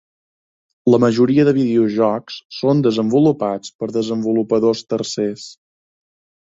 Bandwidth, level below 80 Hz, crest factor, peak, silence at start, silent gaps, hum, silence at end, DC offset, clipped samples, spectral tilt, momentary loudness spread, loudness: 7.8 kHz; -58 dBFS; 16 dB; -2 dBFS; 0.85 s; 2.45-2.50 s, 3.75-3.79 s; none; 0.95 s; under 0.1%; under 0.1%; -6.5 dB/octave; 10 LU; -17 LUFS